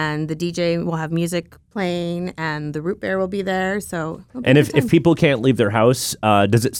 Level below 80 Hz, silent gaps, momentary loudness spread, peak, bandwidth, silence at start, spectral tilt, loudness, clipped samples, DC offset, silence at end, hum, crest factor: -50 dBFS; none; 10 LU; -2 dBFS; 18 kHz; 0 s; -5.5 dB/octave; -19 LUFS; under 0.1%; under 0.1%; 0 s; none; 16 dB